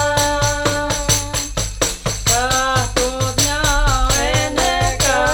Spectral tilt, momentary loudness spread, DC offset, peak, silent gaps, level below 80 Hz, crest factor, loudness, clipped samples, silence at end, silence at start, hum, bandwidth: -2.5 dB/octave; 4 LU; under 0.1%; 0 dBFS; none; -26 dBFS; 16 dB; -17 LUFS; under 0.1%; 0 s; 0 s; none; over 20 kHz